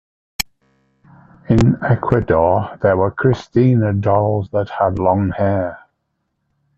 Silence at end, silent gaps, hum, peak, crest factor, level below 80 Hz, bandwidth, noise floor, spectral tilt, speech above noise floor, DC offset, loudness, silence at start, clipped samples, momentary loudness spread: 1 s; none; none; 0 dBFS; 16 dB; -40 dBFS; 8.2 kHz; -71 dBFS; -7.5 dB/octave; 56 dB; under 0.1%; -17 LUFS; 0.4 s; under 0.1%; 11 LU